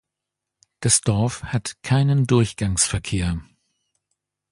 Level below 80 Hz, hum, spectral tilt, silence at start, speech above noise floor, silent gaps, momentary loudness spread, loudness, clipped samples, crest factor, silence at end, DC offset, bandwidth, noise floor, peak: -40 dBFS; none; -4.5 dB/octave; 0.8 s; 64 dB; none; 9 LU; -21 LUFS; under 0.1%; 20 dB; 1.1 s; under 0.1%; 11.5 kHz; -84 dBFS; -2 dBFS